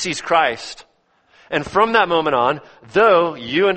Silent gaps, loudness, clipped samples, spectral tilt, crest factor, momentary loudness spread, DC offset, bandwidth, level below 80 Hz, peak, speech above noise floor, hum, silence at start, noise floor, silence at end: none; -17 LUFS; under 0.1%; -4 dB/octave; 18 dB; 11 LU; under 0.1%; 8.8 kHz; -54 dBFS; 0 dBFS; 41 dB; none; 0 s; -58 dBFS; 0 s